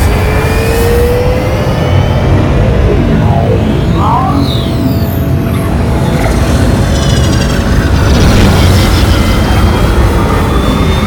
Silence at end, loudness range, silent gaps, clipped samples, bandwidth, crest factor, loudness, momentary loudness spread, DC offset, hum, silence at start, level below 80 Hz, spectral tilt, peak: 0 s; 2 LU; none; 0.5%; 19.5 kHz; 8 dB; -9 LUFS; 4 LU; under 0.1%; none; 0 s; -14 dBFS; -6.5 dB/octave; 0 dBFS